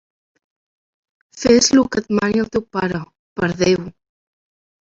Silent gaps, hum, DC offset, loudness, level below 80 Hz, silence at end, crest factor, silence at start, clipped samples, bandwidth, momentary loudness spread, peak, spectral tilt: 3.19-3.36 s; none; under 0.1%; -17 LUFS; -48 dBFS; 0.95 s; 18 dB; 1.35 s; under 0.1%; 7.8 kHz; 13 LU; -2 dBFS; -4 dB/octave